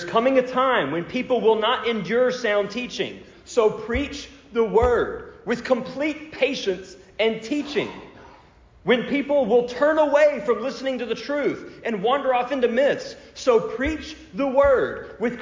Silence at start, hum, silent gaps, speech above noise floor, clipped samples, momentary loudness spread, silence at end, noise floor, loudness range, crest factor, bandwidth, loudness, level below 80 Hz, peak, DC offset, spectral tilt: 0 s; none; none; 30 dB; under 0.1%; 10 LU; 0 s; -51 dBFS; 4 LU; 16 dB; 7.6 kHz; -22 LUFS; -46 dBFS; -8 dBFS; under 0.1%; -5 dB/octave